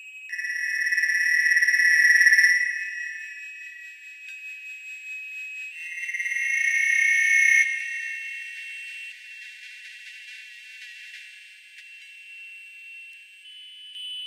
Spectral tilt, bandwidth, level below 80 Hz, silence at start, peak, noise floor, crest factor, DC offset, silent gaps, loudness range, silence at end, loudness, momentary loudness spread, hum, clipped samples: 12.5 dB/octave; 15 kHz; under -90 dBFS; 0 s; -6 dBFS; -47 dBFS; 20 dB; under 0.1%; none; 22 LU; 0 s; -20 LUFS; 25 LU; none; under 0.1%